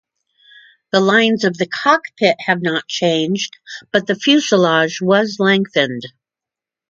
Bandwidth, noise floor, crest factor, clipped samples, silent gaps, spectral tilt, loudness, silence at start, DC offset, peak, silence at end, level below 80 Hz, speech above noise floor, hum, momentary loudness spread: 7.6 kHz; -87 dBFS; 16 dB; under 0.1%; none; -4.5 dB/octave; -16 LUFS; 0.95 s; under 0.1%; 0 dBFS; 0.8 s; -66 dBFS; 71 dB; none; 8 LU